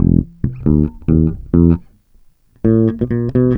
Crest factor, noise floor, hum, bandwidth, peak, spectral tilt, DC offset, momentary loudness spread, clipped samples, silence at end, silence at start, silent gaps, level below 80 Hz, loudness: 14 dB; -49 dBFS; none; 3.4 kHz; 0 dBFS; -13 dB/octave; under 0.1%; 7 LU; under 0.1%; 0 s; 0 s; none; -26 dBFS; -15 LUFS